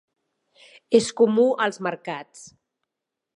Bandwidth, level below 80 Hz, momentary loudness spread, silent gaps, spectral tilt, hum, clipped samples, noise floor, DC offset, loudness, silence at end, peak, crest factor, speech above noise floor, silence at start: 11 kHz; -70 dBFS; 16 LU; none; -4.5 dB/octave; none; under 0.1%; -85 dBFS; under 0.1%; -21 LUFS; 0.9 s; -4 dBFS; 20 dB; 63 dB; 0.9 s